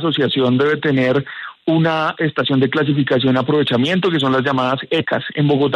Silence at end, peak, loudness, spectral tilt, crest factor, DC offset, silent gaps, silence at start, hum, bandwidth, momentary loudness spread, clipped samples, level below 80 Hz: 0 s; -4 dBFS; -17 LUFS; -7.5 dB/octave; 12 dB; under 0.1%; none; 0 s; none; 10 kHz; 3 LU; under 0.1%; -58 dBFS